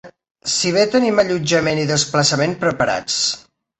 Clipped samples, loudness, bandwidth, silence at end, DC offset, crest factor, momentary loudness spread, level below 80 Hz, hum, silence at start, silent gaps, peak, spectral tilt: under 0.1%; -17 LUFS; 8.8 kHz; 0.4 s; under 0.1%; 16 dB; 5 LU; -52 dBFS; none; 0.05 s; 0.31-0.35 s; -2 dBFS; -3.5 dB/octave